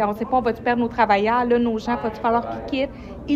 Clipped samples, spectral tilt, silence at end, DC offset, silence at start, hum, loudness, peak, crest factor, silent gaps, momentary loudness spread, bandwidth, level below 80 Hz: under 0.1%; -6.5 dB/octave; 0 s; under 0.1%; 0 s; none; -21 LUFS; -6 dBFS; 16 dB; none; 8 LU; 13 kHz; -44 dBFS